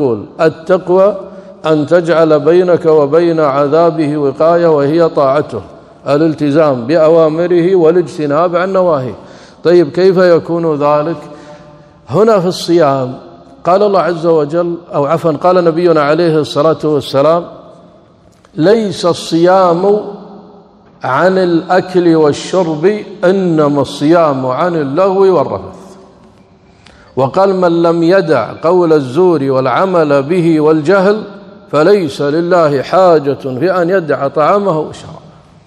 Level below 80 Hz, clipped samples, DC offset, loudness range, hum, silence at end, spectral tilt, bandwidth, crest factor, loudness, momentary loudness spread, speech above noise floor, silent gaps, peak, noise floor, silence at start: -54 dBFS; 0.5%; under 0.1%; 3 LU; none; 0.5 s; -7 dB/octave; 12 kHz; 10 dB; -11 LUFS; 8 LU; 34 dB; none; 0 dBFS; -44 dBFS; 0 s